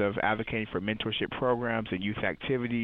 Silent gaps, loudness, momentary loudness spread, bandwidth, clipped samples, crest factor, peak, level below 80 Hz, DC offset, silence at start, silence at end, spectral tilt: none; -30 LUFS; 4 LU; 4.7 kHz; under 0.1%; 18 dB; -12 dBFS; -54 dBFS; under 0.1%; 0 s; 0 s; -8.5 dB/octave